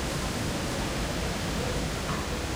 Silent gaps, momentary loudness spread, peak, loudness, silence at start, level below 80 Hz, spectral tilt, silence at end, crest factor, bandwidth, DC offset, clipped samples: none; 1 LU; -16 dBFS; -30 LUFS; 0 s; -38 dBFS; -4 dB/octave; 0 s; 14 dB; 16 kHz; under 0.1%; under 0.1%